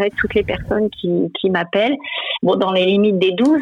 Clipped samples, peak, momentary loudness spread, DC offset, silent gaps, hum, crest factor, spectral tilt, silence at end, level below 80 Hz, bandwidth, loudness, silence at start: under 0.1%; -4 dBFS; 5 LU; under 0.1%; none; none; 12 dB; -7 dB/octave; 0 s; -42 dBFS; 10 kHz; -17 LUFS; 0 s